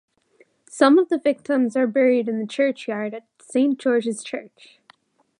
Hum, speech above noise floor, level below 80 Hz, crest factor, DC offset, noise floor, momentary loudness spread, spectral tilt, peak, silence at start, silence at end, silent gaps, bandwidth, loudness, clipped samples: none; 39 dB; -78 dBFS; 20 dB; under 0.1%; -59 dBFS; 15 LU; -5 dB/octave; -2 dBFS; 0.75 s; 0.95 s; none; 11 kHz; -21 LUFS; under 0.1%